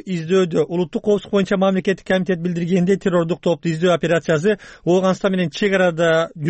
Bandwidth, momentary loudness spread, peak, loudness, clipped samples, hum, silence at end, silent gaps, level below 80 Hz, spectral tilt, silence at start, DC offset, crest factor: 8.6 kHz; 4 LU; -6 dBFS; -18 LUFS; under 0.1%; none; 0 s; none; -54 dBFS; -6.5 dB/octave; 0.05 s; under 0.1%; 12 dB